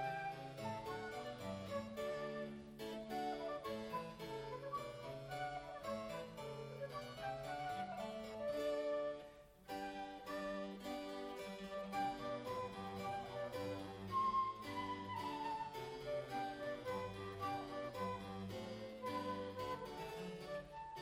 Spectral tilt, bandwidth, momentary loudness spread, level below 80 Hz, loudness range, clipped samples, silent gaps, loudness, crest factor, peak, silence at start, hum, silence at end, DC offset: -5.5 dB/octave; 16 kHz; 6 LU; -70 dBFS; 4 LU; under 0.1%; none; -46 LUFS; 16 dB; -30 dBFS; 0 s; none; 0 s; under 0.1%